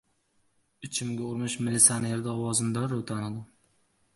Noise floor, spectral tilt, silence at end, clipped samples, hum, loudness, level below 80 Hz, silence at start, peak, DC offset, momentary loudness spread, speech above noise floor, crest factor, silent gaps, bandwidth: -70 dBFS; -3.5 dB/octave; 0.7 s; under 0.1%; none; -27 LUFS; -64 dBFS; 0.8 s; -4 dBFS; under 0.1%; 15 LU; 42 dB; 28 dB; none; 12 kHz